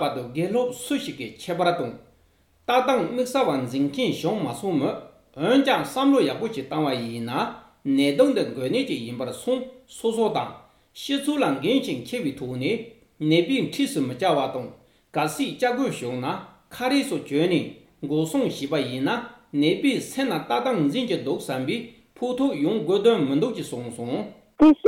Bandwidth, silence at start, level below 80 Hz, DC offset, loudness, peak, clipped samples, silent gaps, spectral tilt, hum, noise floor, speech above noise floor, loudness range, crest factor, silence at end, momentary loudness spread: 16.5 kHz; 0 s; -60 dBFS; under 0.1%; -24 LUFS; -6 dBFS; under 0.1%; none; -5.5 dB/octave; none; -61 dBFS; 38 dB; 3 LU; 18 dB; 0 s; 11 LU